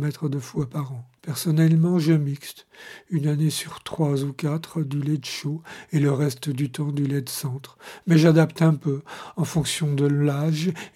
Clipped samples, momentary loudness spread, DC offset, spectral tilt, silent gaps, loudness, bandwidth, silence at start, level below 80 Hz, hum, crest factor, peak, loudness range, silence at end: under 0.1%; 16 LU; under 0.1%; -6.5 dB/octave; none; -23 LUFS; 15 kHz; 0 s; -60 dBFS; none; 18 dB; -4 dBFS; 5 LU; 0.1 s